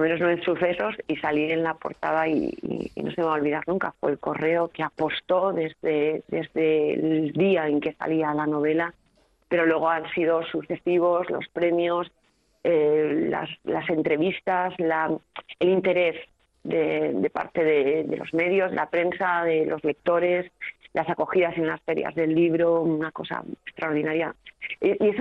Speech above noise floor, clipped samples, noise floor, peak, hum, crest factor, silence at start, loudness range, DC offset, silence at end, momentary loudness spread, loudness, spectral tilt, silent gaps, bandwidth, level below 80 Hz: 40 dB; under 0.1%; -64 dBFS; -10 dBFS; none; 14 dB; 0 s; 2 LU; under 0.1%; 0 s; 8 LU; -25 LUFS; -8 dB/octave; none; 5.4 kHz; -64 dBFS